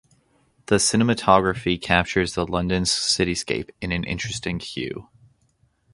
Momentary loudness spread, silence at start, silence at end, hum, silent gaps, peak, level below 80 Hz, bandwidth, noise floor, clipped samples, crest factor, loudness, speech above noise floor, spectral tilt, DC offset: 11 LU; 0.7 s; 0.9 s; none; none; 0 dBFS; -42 dBFS; 11.5 kHz; -64 dBFS; under 0.1%; 24 dB; -22 LUFS; 42 dB; -4 dB/octave; under 0.1%